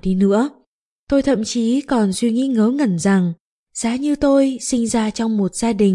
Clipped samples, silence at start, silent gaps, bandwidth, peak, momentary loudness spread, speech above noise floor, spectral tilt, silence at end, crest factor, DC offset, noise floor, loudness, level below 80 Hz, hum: under 0.1%; 0.05 s; 0.66-1.07 s, 3.40-3.66 s; 11.5 kHz; -4 dBFS; 6 LU; 47 dB; -5.5 dB/octave; 0 s; 14 dB; under 0.1%; -64 dBFS; -18 LUFS; -44 dBFS; none